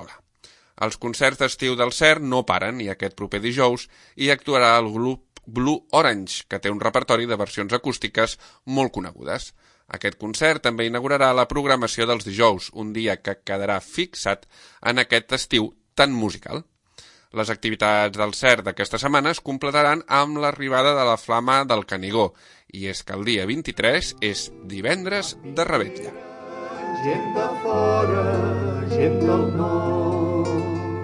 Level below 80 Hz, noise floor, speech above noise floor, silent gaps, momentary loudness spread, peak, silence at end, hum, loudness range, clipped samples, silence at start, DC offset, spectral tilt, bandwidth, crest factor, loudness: -50 dBFS; -54 dBFS; 32 dB; none; 12 LU; 0 dBFS; 0 s; none; 4 LU; under 0.1%; 0 s; under 0.1%; -4.5 dB/octave; 11.5 kHz; 22 dB; -22 LUFS